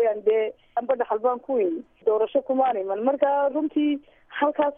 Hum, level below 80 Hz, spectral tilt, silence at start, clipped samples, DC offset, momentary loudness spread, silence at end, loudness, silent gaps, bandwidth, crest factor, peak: none; -68 dBFS; -8.5 dB/octave; 0 s; under 0.1%; under 0.1%; 6 LU; 0.05 s; -24 LUFS; none; 3.7 kHz; 16 dB; -8 dBFS